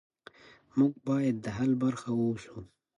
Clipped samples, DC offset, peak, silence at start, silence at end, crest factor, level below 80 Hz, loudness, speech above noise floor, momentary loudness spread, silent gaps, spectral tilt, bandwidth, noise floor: under 0.1%; under 0.1%; -14 dBFS; 0.75 s; 0.3 s; 18 dB; -64 dBFS; -30 LUFS; 26 dB; 11 LU; none; -7.5 dB/octave; 11 kHz; -55 dBFS